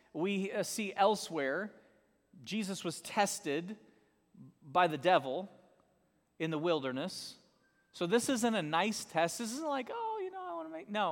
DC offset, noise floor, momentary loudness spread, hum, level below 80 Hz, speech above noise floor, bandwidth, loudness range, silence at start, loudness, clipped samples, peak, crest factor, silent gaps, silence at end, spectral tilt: under 0.1%; -74 dBFS; 12 LU; none; -80 dBFS; 40 dB; 18 kHz; 3 LU; 0.15 s; -35 LUFS; under 0.1%; -14 dBFS; 22 dB; none; 0 s; -4 dB/octave